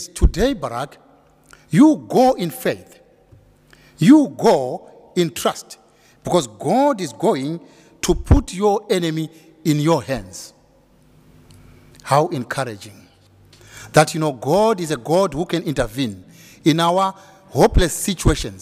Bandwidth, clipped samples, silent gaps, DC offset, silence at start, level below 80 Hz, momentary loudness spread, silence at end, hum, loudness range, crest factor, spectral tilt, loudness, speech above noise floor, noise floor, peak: 16 kHz; under 0.1%; none; under 0.1%; 0 s; -30 dBFS; 16 LU; 0.05 s; none; 6 LU; 20 dB; -5.5 dB/octave; -19 LUFS; 36 dB; -54 dBFS; 0 dBFS